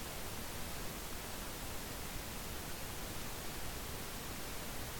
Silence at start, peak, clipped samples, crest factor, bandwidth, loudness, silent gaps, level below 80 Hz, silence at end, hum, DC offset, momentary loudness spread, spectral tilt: 0 s; -30 dBFS; under 0.1%; 14 dB; 17.5 kHz; -44 LUFS; none; -52 dBFS; 0 s; none; under 0.1%; 0 LU; -3 dB/octave